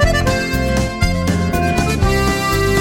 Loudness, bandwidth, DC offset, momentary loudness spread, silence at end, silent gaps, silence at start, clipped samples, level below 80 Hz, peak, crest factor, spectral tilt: -16 LUFS; 17 kHz; under 0.1%; 2 LU; 0 s; none; 0 s; under 0.1%; -22 dBFS; -2 dBFS; 12 dB; -5 dB/octave